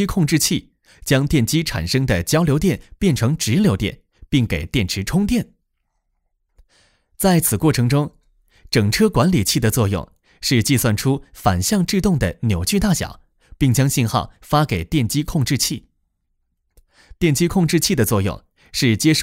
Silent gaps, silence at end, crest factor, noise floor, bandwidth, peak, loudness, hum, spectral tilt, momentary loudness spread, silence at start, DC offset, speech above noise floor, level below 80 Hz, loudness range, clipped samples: none; 0 s; 16 dB; -71 dBFS; 16.5 kHz; -2 dBFS; -18 LUFS; none; -5 dB/octave; 6 LU; 0 s; under 0.1%; 53 dB; -36 dBFS; 3 LU; under 0.1%